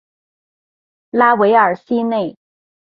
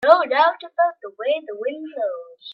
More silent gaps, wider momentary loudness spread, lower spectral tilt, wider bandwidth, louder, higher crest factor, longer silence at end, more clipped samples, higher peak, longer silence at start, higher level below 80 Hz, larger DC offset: neither; about the same, 11 LU vs 13 LU; first, -8.5 dB/octave vs -4 dB/octave; second, 5.2 kHz vs 5.8 kHz; first, -15 LUFS vs -21 LUFS; about the same, 16 dB vs 20 dB; first, 0.55 s vs 0 s; neither; about the same, 0 dBFS vs 0 dBFS; first, 1.15 s vs 0 s; first, -66 dBFS vs -76 dBFS; neither